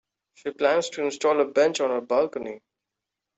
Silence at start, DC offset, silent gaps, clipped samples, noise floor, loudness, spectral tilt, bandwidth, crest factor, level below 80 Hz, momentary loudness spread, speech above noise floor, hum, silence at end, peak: 0.45 s; under 0.1%; none; under 0.1%; -86 dBFS; -24 LUFS; -3 dB/octave; 8.2 kHz; 18 dB; -70 dBFS; 14 LU; 62 dB; none; 0.8 s; -8 dBFS